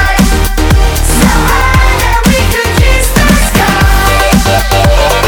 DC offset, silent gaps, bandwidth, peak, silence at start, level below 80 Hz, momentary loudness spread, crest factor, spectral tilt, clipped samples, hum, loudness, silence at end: under 0.1%; none; over 20 kHz; 0 dBFS; 0 s; -10 dBFS; 2 LU; 6 dB; -4.5 dB/octave; 0.2%; none; -8 LUFS; 0 s